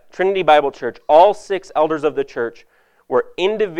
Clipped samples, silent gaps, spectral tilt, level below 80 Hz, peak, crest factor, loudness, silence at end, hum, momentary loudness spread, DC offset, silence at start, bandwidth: under 0.1%; none; -5 dB/octave; -54 dBFS; 0 dBFS; 18 dB; -17 LUFS; 0 s; none; 12 LU; under 0.1%; 0.2 s; 9.8 kHz